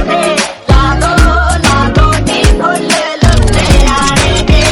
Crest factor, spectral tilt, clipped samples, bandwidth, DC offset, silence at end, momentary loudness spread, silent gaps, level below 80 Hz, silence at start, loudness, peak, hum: 8 dB; -4.5 dB/octave; 3%; 14 kHz; under 0.1%; 0 s; 3 LU; none; -12 dBFS; 0 s; -9 LUFS; 0 dBFS; none